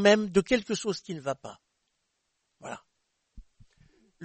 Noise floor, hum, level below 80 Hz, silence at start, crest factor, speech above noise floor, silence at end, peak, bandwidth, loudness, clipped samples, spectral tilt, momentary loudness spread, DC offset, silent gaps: -78 dBFS; none; -58 dBFS; 0 s; 22 dB; 52 dB; 0 s; -8 dBFS; 8.8 kHz; -28 LUFS; under 0.1%; -4.5 dB/octave; 21 LU; under 0.1%; none